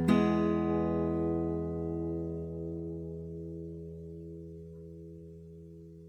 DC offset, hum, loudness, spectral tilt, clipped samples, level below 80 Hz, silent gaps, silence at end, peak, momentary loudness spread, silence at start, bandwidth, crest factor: under 0.1%; none; -33 LUFS; -9 dB/octave; under 0.1%; -52 dBFS; none; 0 s; -12 dBFS; 20 LU; 0 s; 10 kHz; 22 dB